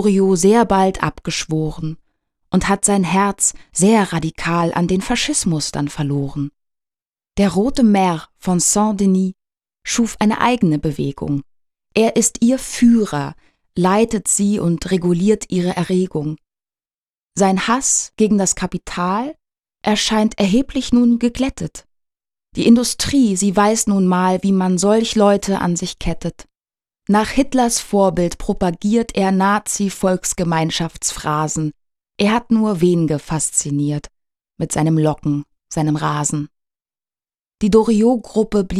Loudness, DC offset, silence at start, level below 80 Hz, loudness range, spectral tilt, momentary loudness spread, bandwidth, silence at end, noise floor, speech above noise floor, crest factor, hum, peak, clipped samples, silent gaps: -17 LUFS; under 0.1%; 0 s; -40 dBFS; 3 LU; -5 dB/octave; 10 LU; 14.5 kHz; 0 s; under -90 dBFS; over 74 dB; 16 dB; none; 0 dBFS; under 0.1%; none